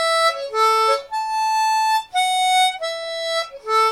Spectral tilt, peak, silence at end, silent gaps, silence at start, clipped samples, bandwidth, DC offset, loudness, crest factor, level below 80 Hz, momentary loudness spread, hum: 2 dB/octave; -6 dBFS; 0 s; none; 0 s; under 0.1%; 17 kHz; under 0.1%; -19 LUFS; 12 dB; -62 dBFS; 8 LU; none